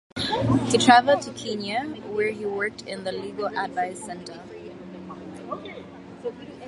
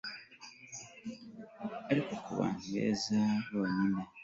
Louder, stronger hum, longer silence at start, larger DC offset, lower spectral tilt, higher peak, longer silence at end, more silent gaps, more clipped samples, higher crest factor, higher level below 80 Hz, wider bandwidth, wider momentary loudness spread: first, -24 LUFS vs -35 LUFS; neither; about the same, 0.15 s vs 0.05 s; neither; about the same, -4.5 dB/octave vs -5.5 dB/octave; first, -2 dBFS vs -16 dBFS; about the same, 0 s vs 0 s; neither; neither; first, 24 dB vs 18 dB; first, -54 dBFS vs -70 dBFS; first, 11.5 kHz vs 8 kHz; first, 23 LU vs 17 LU